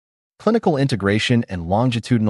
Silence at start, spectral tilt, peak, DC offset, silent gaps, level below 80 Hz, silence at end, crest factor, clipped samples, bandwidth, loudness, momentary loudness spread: 0.4 s; -6.5 dB/octave; -4 dBFS; under 0.1%; none; -48 dBFS; 0 s; 14 dB; under 0.1%; 11.5 kHz; -19 LUFS; 3 LU